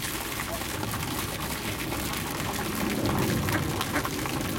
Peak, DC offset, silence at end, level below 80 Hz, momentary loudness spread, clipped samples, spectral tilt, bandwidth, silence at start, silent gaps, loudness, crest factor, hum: -12 dBFS; under 0.1%; 0 s; -44 dBFS; 4 LU; under 0.1%; -4 dB/octave; 17 kHz; 0 s; none; -29 LUFS; 18 dB; none